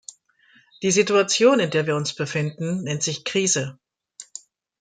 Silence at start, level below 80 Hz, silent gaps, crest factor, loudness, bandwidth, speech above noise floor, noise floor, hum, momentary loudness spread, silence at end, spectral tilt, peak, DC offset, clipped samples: 0.8 s; -66 dBFS; none; 20 dB; -21 LUFS; 10 kHz; 37 dB; -58 dBFS; none; 22 LU; 0.6 s; -3.5 dB/octave; -4 dBFS; under 0.1%; under 0.1%